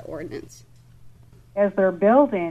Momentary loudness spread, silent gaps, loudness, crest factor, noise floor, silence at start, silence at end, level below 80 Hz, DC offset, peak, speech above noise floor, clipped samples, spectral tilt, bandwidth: 18 LU; none; -19 LUFS; 18 dB; -48 dBFS; 0 s; 0 s; -56 dBFS; 0.1%; -4 dBFS; 28 dB; under 0.1%; -8 dB/octave; 9 kHz